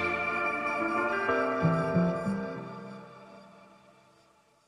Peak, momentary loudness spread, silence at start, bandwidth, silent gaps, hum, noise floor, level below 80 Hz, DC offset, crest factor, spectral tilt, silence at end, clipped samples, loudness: -14 dBFS; 18 LU; 0 s; 10 kHz; none; none; -64 dBFS; -62 dBFS; under 0.1%; 18 dB; -7.5 dB/octave; 1 s; under 0.1%; -29 LUFS